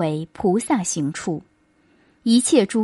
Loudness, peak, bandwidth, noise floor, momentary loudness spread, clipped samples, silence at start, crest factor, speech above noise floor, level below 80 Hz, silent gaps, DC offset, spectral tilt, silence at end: -21 LUFS; -4 dBFS; 11.5 kHz; -59 dBFS; 12 LU; under 0.1%; 0 s; 18 dB; 40 dB; -58 dBFS; none; under 0.1%; -4.5 dB/octave; 0 s